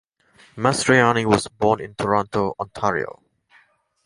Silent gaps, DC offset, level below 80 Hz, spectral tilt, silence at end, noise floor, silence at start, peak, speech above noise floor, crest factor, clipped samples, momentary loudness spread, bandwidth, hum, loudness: none; under 0.1%; -52 dBFS; -5 dB/octave; 0.95 s; -58 dBFS; 0.55 s; -2 dBFS; 38 dB; 20 dB; under 0.1%; 9 LU; 11.5 kHz; none; -20 LUFS